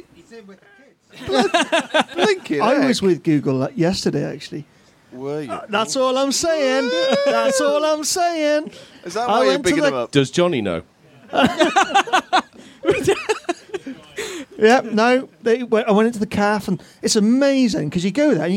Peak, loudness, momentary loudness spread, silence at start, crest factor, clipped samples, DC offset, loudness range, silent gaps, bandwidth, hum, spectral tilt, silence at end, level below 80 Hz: -2 dBFS; -18 LUFS; 13 LU; 0.3 s; 18 dB; under 0.1%; under 0.1%; 3 LU; none; 16.5 kHz; none; -4.5 dB/octave; 0 s; -54 dBFS